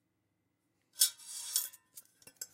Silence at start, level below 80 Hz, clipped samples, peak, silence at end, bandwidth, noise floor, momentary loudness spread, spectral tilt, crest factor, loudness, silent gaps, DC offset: 0.95 s; under -90 dBFS; under 0.1%; -10 dBFS; 0.1 s; 16.5 kHz; -81 dBFS; 23 LU; 4 dB/octave; 30 dB; -33 LUFS; none; under 0.1%